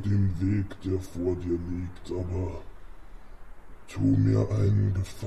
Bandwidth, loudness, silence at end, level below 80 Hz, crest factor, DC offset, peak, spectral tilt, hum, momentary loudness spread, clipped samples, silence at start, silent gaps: 10.5 kHz; -28 LUFS; 0 s; -44 dBFS; 14 dB; 0.7%; -12 dBFS; -9 dB/octave; none; 12 LU; under 0.1%; 0 s; none